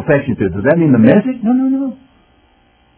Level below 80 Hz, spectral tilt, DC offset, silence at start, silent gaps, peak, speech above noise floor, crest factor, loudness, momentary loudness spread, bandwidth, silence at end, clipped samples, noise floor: -42 dBFS; -12.5 dB/octave; under 0.1%; 0 s; none; 0 dBFS; 40 dB; 14 dB; -13 LUFS; 9 LU; 4 kHz; 1.05 s; 0.2%; -52 dBFS